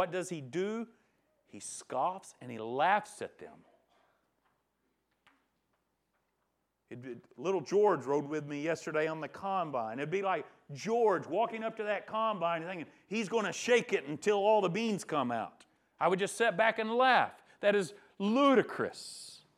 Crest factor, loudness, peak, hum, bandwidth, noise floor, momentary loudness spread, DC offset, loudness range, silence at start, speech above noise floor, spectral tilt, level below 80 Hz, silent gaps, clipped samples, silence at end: 22 dB; -32 LUFS; -12 dBFS; none; 13.5 kHz; -81 dBFS; 17 LU; under 0.1%; 7 LU; 0 s; 49 dB; -4.5 dB/octave; -84 dBFS; none; under 0.1%; 0.2 s